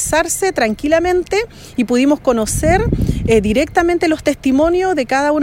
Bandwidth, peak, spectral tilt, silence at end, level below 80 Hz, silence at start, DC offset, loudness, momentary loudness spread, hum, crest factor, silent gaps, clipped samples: 16.5 kHz; -2 dBFS; -5 dB/octave; 0 s; -30 dBFS; 0 s; under 0.1%; -15 LUFS; 4 LU; none; 14 dB; none; under 0.1%